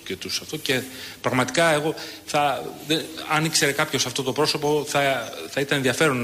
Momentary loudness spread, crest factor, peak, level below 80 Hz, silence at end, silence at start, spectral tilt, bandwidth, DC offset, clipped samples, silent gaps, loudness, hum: 8 LU; 16 dB; -8 dBFS; -60 dBFS; 0 s; 0 s; -3.5 dB/octave; 15.5 kHz; under 0.1%; under 0.1%; none; -23 LUFS; none